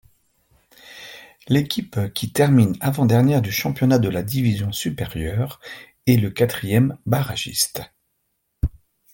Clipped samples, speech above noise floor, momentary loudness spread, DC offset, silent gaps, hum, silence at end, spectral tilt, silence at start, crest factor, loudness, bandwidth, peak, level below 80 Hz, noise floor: under 0.1%; 53 dB; 15 LU; under 0.1%; none; none; 0.45 s; -5.5 dB/octave; 0.85 s; 18 dB; -21 LUFS; 17 kHz; -4 dBFS; -42 dBFS; -72 dBFS